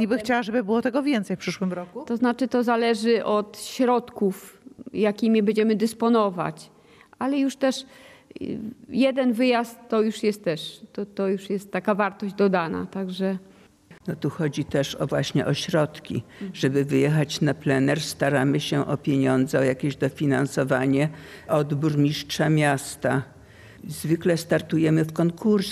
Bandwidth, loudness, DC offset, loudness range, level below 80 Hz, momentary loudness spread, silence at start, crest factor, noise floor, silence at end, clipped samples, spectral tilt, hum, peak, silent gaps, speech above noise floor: 14.5 kHz; -24 LUFS; under 0.1%; 4 LU; -60 dBFS; 11 LU; 0 s; 16 dB; -52 dBFS; 0 s; under 0.1%; -6 dB/octave; none; -8 dBFS; none; 28 dB